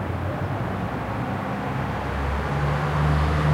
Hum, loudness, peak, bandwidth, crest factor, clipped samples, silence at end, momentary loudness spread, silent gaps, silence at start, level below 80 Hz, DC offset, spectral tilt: none; -25 LUFS; -10 dBFS; 15.5 kHz; 14 dB; under 0.1%; 0 s; 6 LU; none; 0 s; -32 dBFS; under 0.1%; -7.5 dB/octave